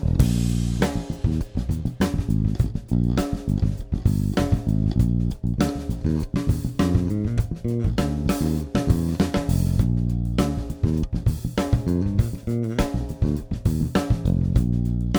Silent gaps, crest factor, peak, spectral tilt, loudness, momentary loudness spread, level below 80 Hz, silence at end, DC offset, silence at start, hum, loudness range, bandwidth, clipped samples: none; 18 dB; -4 dBFS; -7.5 dB/octave; -24 LUFS; 4 LU; -28 dBFS; 0 s; under 0.1%; 0 s; none; 1 LU; over 20 kHz; under 0.1%